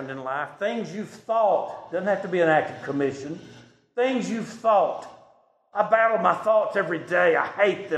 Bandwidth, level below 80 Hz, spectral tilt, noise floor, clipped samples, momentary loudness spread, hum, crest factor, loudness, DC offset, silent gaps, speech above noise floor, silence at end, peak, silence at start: 9.8 kHz; -72 dBFS; -5.5 dB/octave; -59 dBFS; under 0.1%; 13 LU; none; 20 dB; -24 LUFS; under 0.1%; none; 35 dB; 0 s; -6 dBFS; 0 s